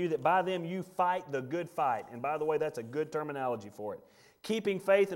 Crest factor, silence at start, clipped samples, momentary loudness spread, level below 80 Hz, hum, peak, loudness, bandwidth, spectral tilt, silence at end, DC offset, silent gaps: 18 dB; 0 s; under 0.1%; 12 LU; -76 dBFS; none; -14 dBFS; -33 LUFS; 16.5 kHz; -6 dB/octave; 0 s; under 0.1%; none